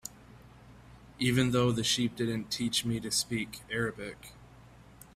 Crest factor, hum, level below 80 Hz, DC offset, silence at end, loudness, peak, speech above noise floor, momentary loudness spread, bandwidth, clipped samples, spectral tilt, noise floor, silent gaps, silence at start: 20 dB; none; -58 dBFS; under 0.1%; 0.45 s; -30 LUFS; -12 dBFS; 24 dB; 16 LU; 16 kHz; under 0.1%; -4 dB/octave; -54 dBFS; none; 0.05 s